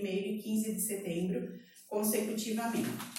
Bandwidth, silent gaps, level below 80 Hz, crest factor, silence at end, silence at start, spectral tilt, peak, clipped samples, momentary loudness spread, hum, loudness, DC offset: 16.5 kHz; none; -76 dBFS; 16 dB; 0 s; 0 s; -4.5 dB/octave; -20 dBFS; under 0.1%; 7 LU; none; -34 LUFS; under 0.1%